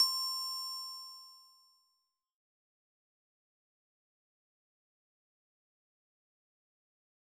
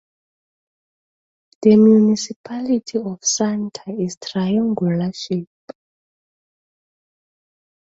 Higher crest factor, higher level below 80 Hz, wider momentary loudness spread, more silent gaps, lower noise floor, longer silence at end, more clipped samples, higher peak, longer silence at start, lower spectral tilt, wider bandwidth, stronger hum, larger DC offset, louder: first, 26 dB vs 18 dB; second, under -90 dBFS vs -62 dBFS; first, 19 LU vs 14 LU; second, none vs 2.36-2.44 s, 4.17-4.21 s; second, -82 dBFS vs under -90 dBFS; first, 5.95 s vs 2.5 s; neither; second, -18 dBFS vs -2 dBFS; second, 0 s vs 1.6 s; second, 5.5 dB/octave vs -5.5 dB/octave; first, over 20 kHz vs 8 kHz; neither; neither; second, -35 LUFS vs -18 LUFS